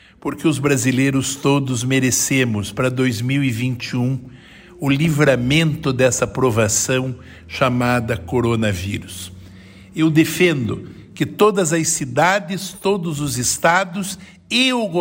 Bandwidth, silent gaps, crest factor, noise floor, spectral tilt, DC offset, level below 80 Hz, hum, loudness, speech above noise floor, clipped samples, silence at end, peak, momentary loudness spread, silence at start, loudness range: 16.5 kHz; none; 16 dB; -41 dBFS; -4.5 dB/octave; under 0.1%; -46 dBFS; none; -18 LUFS; 23 dB; under 0.1%; 0 s; -4 dBFS; 11 LU; 0.25 s; 2 LU